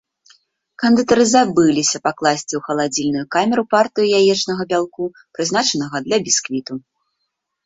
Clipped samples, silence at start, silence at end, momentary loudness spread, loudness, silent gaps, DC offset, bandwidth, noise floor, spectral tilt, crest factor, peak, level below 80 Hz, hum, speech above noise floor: under 0.1%; 0.8 s; 0.85 s; 11 LU; -17 LUFS; none; under 0.1%; 8 kHz; -75 dBFS; -3.5 dB/octave; 16 dB; -2 dBFS; -58 dBFS; none; 58 dB